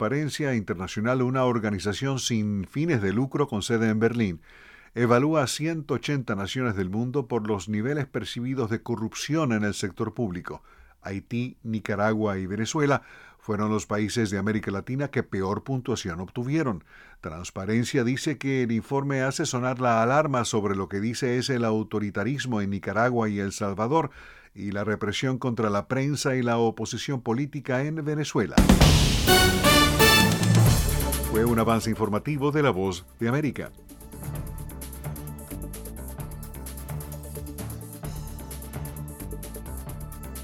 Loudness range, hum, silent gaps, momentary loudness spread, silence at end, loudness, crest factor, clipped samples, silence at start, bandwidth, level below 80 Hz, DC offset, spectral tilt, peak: 17 LU; none; none; 17 LU; 0 s; -25 LUFS; 22 dB; under 0.1%; 0 s; 18 kHz; -38 dBFS; under 0.1%; -5 dB/octave; -4 dBFS